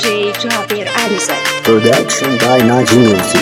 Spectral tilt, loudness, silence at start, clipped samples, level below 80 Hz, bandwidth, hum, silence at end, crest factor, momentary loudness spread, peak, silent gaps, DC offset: -4 dB/octave; -11 LUFS; 0 s; 0.5%; -50 dBFS; 17.5 kHz; none; 0 s; 12 dB; 6 LU; 0 dBFS; none; under 0.1%